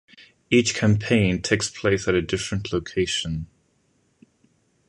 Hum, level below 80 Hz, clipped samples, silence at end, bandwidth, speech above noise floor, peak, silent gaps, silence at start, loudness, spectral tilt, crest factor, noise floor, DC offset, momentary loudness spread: none; -44 dBFS; under 0.1%; 1.45 s; 11.5 kHz; 44 dB; -2 dBFS; none; 0.2 s; -23 LUFS; -5 dB/octave; 22 dB; -66 dBFS; under 0.1%; 7 LU